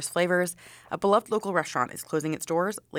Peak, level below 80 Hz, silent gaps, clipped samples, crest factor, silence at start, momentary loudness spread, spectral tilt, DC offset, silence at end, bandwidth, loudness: -10 dBFS; -68 dBFS; none; under 0.1%; 18 dB; 0 s; 7 LU; -4.5 dB/octave; under 0.1%; 0 s; 19.5 kHz; -27 LUFS